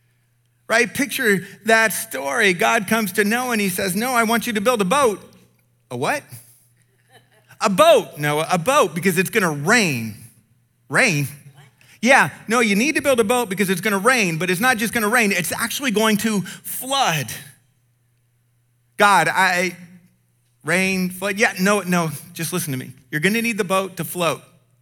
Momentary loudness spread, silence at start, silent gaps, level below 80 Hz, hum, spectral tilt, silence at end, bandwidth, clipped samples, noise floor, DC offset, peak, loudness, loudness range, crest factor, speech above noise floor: 10 LU; 0.7 s; none; -62 dBFS; none; -4 dB/octave; 0.4 s; 19.5 kHz; under 0.1%; -63 dBFS; under 0.1%; -2 dBFS; -18 LUFS; 4 LU; 18 dB; 44 dB